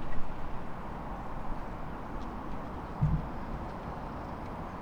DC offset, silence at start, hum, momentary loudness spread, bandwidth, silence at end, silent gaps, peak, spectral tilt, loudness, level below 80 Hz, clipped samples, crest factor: under 0.1%; 0 s; none; 9 LU; 6.2 kHz; 0 s; none; -16 dBFS; -8.5 dB/octave; -39 LUFS; -40 dBFS; under 0.1%; 18 dB